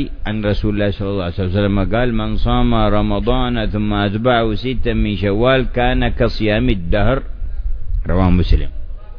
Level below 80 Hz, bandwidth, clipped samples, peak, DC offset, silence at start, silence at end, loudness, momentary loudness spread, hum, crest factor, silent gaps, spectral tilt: -20 dBFS; 5.4 kHz; under 0.1%; 0 dBFS; under 0.1%; 0 s; 0 s; -17 LUFS; 7 LU; none; 16 dB; none; -9 dB/octave